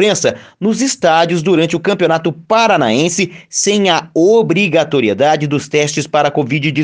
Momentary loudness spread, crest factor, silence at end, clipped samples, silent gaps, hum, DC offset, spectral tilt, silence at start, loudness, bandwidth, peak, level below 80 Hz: 5 LU; 12 dB; 0 s; under 0.1%; none; none; under 0.1%; -4 dB/octave; 0 s; -13 LUFS; 10.5 kHz; 0 dBFS; -56 dBFS